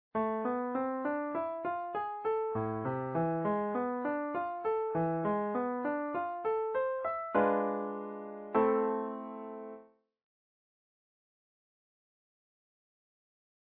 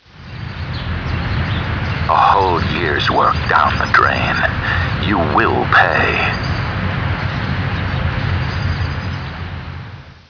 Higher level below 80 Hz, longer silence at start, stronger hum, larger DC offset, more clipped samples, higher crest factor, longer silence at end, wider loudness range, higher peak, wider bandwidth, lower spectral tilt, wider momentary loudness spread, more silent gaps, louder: second, -72 dBFS vs -30 dBFS; about the same, 0.15 s vs 0.15 s; neither; neither; neither; about the same, 20 dB vs 16 dB; first, 3.95 s vs 0.1 s; about the same, 4 LU vs 6 LU; second, -14 dBFS vs 0 dBFS; second, 4.3 kHz vs 5.4 kHz; about the same, -7 dB/octave vs -6.5 dB/octave; second, 10 LU vs 14 LU; neither; second, -34 LUFS vs -16 LUFS